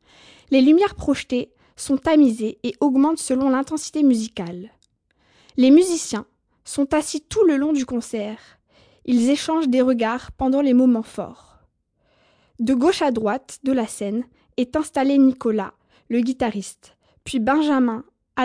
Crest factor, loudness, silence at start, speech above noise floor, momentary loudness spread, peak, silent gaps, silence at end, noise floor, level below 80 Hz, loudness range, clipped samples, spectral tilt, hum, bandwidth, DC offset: 16 dB; -20 LUFS; 0.5 s; 47 dB; 15 LU; -4 dBFS; none; 0 s; -66 dBFS; -52 dBFS; 4 LU; under 0.1%; -4.5 dB/octave; none; 10.5 kHz; under 0.1%